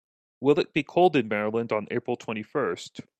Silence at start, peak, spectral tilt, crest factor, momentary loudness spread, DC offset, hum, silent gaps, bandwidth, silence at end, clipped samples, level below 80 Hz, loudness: 0.4 s; -8 dBFS; -6.5 dB/octave; 18 dB; 9 LU; under 0.1%; none; none; 8.8 kHz; 0.2 s; under 0.1%; -68 dBFS; -26 LUFS